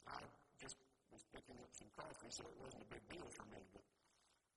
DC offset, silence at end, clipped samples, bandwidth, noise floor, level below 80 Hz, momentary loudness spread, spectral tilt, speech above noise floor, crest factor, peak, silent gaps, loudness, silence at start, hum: under 0.1%; 0.2 s; under 0.1%; 11.5 kHz; -80 dBFS; -76 dBFS; 11 LU; -3 dB/octave; 23 dB; 22 dB; -36 dBFS; none; -58 LUFS; 0 s; none